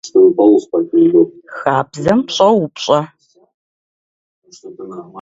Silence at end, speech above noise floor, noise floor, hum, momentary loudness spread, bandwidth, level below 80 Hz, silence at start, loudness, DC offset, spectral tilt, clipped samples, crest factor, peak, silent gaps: 0 s; over 76 dB; under -90 dBFS; none; 20 LU; 7.8 kHz; -54 dBFS; 0.05 s; -13 LUFS; under 0.1%; -6 dB/octave; under 0.1%; 14 dB; 0 dBFS; 3.54-4.42 s